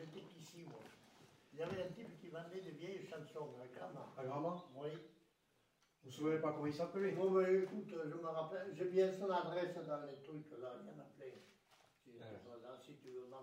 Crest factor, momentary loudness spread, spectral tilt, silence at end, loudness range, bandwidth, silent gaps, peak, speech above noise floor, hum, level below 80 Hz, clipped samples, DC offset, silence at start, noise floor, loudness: 20 dB; 20 LU; -7 dB/octave; 0 s; 11 LU; 15 kHz; none; -24 dBFS; 36 dB; none; -88 dBFS; under 0.1%; under 0.1%; 0 s; -79 dBFS; -43 LUFS